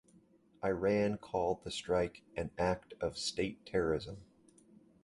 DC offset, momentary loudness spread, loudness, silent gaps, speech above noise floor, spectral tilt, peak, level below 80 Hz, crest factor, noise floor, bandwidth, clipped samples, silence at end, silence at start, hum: under 0.1%; 8 LU; -36 LUFS; none; 31 dB; -5 dB/octave; -20 dBFS; -58 dBFS; 18 dB; -66 dBFS; 11.5 kHz; under 0.1%; 0.8 s; 0.6 s; none